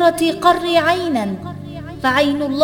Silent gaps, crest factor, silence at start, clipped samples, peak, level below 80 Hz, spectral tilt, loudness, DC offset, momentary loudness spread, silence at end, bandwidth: none; 16 dB; 0 s; under 0.1%; 0 dBFS; -48 dBFS; -5 dB/octave; -16 LUFS; under 0.1%; 15 LU; 0 s; 19 kHz